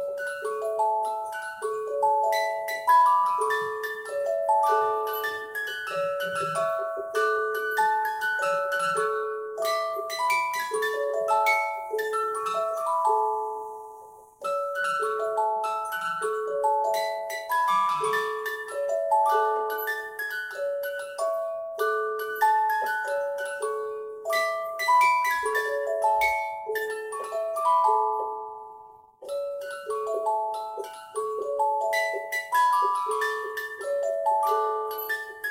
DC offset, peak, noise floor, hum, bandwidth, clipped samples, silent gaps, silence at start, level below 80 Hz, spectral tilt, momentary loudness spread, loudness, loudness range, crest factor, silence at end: under 0.1%; -10 dBFS; -49 dBFS; none; 16.5 kHz; under 0.1%; none; 0 s; -72 dBFS; -1.5 dB/octave; 10 LU; -26 LUFS; 4 LU; 16 dB; 0 s